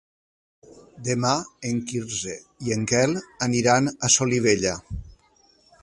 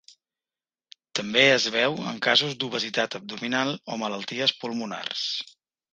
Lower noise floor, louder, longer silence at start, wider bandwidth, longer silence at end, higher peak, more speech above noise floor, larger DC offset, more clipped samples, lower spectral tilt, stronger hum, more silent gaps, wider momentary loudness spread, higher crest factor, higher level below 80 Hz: second, -60 dBFS vs under -90 dBFS; about the same, -23 LUFS vs -24 LUFS; second, 0.7 s vs 1.15 s; first, 11.5 kHz vs 9.8 kHz; first, 0.7 s vs 0.5 s; about the same, -4 dBFS vs -4 dBFS; second, 37 dB vs over 64 dB; neither; neither; about the same, -3.5 dB/octave vs -3 dB/octave; neither; neither; about the same, 14 LU vs 13 LU; about the same, 20 dB vs 24 dB; first, -48 dBFS vs -72 dBFS